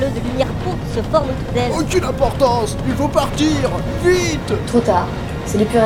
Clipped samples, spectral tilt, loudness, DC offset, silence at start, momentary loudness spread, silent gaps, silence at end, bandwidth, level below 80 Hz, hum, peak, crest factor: under 0.1%; -5.5 dB/octave; -18 LUFS; under 0.1%; 0 s; 6 LU; none; 0 s; 17.5 kHz; -30 dBFS; none; -2 dBFS; 16 dB